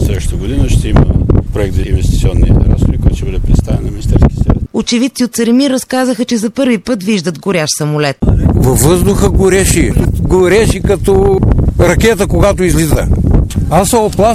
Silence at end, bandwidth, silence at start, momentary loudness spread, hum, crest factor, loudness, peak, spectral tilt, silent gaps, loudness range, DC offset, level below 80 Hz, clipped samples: 0 s; 16 kHz; 0 s; 5 LU; none; 10 dB; -11 LUFS; 0 dBFS; -6 dB/octave; none; 3 LU; under 0.1%; -16 dBFS; under 0.1%